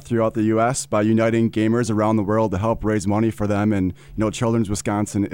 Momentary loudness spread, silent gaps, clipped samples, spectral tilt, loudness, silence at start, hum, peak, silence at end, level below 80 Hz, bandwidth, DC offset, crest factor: 4 LU; none; under 0.1%; -6.5 dB/octave; -20 LUFS; 0 s; none; -6 dBFS; 0 s; -44 dBFS; 16.5 kHz; 0.3%; 12 dB